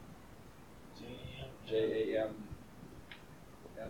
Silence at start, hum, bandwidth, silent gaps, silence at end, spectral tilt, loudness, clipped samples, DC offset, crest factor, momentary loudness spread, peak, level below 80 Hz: 0 s; none; 18.5 kHz; none; 0 s; -6 dB/octave; -39 LUFS; under 0.1%; under 0.1%; 18 dB; 22 LU; -24 dBFS; -62 dBFS